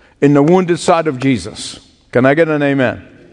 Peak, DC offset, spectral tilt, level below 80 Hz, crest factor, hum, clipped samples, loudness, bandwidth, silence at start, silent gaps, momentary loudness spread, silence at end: 0 dBFS; under 0.1%; -6 dB/octave; -50 dBFS; 14 dB; none; 0.1%; -13 LUFS; 10.5 kHz; 0.2 s; none; 15 LU; 0.3 s